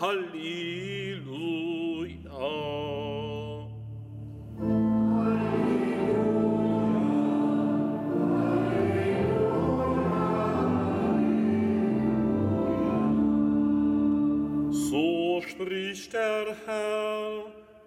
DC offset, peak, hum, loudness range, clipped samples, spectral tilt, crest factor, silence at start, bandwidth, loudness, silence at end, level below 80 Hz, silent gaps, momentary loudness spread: under 0.1%; -14 dBFS; none; 7 LU; under 0.1%; -7 dB/octave; 14 dB; 0 s; 13 kHz; -27 LUFS; 0.25 s; -52 dBFS; none; 10 LU